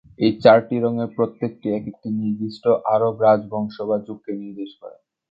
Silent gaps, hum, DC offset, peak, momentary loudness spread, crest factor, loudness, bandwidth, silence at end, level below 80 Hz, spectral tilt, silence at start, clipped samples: none; none; under 0.1%; 0 dBFS; 16 LU; 20 dB; -20 LUFS; 7.2 kHz; 0.4 s; -62 dBFS; -9 dB/octave; 0.2 s; under 0.1%